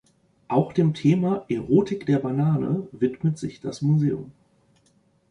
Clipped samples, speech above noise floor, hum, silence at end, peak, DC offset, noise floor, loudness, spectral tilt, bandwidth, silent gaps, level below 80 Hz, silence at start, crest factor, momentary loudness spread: under 0.1%; 41 dB; none; 1 s; -6 dBFS; under 0.1%; -63 dBFS; -24 LUFS; -8.5 dB/octave; 10 kHz; none; -58 dBFS; 0.5 s; 18 dB; 7 LU